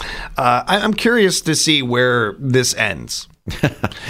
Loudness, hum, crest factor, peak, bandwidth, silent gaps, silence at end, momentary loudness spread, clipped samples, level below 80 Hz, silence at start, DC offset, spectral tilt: -16 LUFS; none; 16 dB; -2 dBFS; 16 kHz; none; 0 s; 11 LU; under 0.1%; -40 dBFS; 0 s; under 0.1%; -3.5 dB/octave